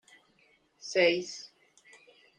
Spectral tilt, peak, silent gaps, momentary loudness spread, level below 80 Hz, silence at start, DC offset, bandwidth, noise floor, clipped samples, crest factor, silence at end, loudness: -3 dB/octave; -12 dBFS; none; 21 LU; -80 dBFS; 0.85 s; under 0.1%; 9.8 kHz; -67 dBFS; under 0.1%; 22 dB; 0.95 s; -28 LUFS